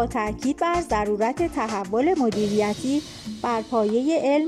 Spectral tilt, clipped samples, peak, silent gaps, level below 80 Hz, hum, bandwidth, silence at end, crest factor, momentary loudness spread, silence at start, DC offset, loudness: -5.5 dB/octave; under 0.1%; -10 dBFS; none; -46 dBFS; none; 14 kHz; 0 s; 12 dB; 5 LU; 0 s; under 0.1%; -24 LUFS